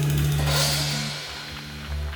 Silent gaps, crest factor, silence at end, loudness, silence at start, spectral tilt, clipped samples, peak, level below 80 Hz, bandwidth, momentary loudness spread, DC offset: none; 14 dB; 0 s; -24 LUFS; 0 s; -4 dB/octave; under 0.1%; -10 dBFS; -34 dBFS; over 20 kHz; 13 LU; under 0.1%